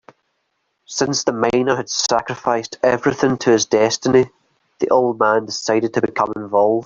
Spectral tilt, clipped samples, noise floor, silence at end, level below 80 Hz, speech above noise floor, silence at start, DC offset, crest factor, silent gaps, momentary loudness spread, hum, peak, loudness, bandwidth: -4 dB/octave; under 0.1%; -70 dBFS; 0 s; -56 dBFS; 53 dB; 0.9 s; under 0.1%; 16 dB; none; 6 LU; none; -2 dBFS; -18 LUFS; 7.6 kHz